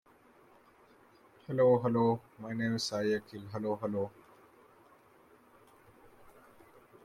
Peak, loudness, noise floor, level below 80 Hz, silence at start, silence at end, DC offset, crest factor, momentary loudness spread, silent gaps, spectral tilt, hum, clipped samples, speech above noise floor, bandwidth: -16 dBFS; -32 LUFS; -62 dBFS; -74 dBFS; 1.5 s; 2.95 s; under 0.1%; 20 dB; 15 LU; none; -6 dB/octave; none; under 0.1%; 31 dB; 14 kHz